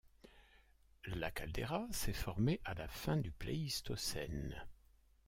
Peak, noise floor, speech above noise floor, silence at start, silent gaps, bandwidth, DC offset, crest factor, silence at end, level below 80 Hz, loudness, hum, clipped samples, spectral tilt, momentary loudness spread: -24 dBFS; -68 dBFS; 28 dB; 0.05 s; none; 16.5 kHz; under 0.1%; 18 dB; 0.55 s; -52 dBFS; -42 LUFS; none; under 0.1%; -5 dB/octave; 10 LU